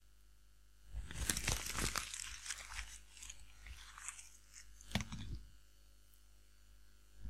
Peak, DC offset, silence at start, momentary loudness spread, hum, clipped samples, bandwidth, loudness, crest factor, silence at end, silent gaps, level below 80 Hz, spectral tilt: -14 dBFS; 0.1%; 0 s; 18 LU; 50 Hz at -60 dBFS; under 0.1%; 16 kHz; -44 LUFS; 32 dB; 0 s; none; -54 dBFS; -2 dB/octave